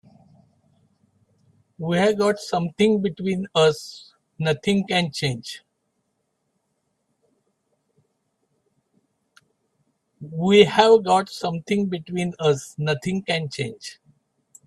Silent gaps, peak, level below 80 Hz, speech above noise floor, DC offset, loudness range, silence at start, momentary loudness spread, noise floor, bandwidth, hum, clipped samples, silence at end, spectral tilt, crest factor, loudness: none; 0 dBFS; -62 dBFS; 53 dB; under 0.1%; 7 LU; 1.8 s; 18 LU; -74 dBFS; 13 kHz; none; under 0.1%; 0.75 s; -5.5 dB/octave; 24 dB; -21 LUFS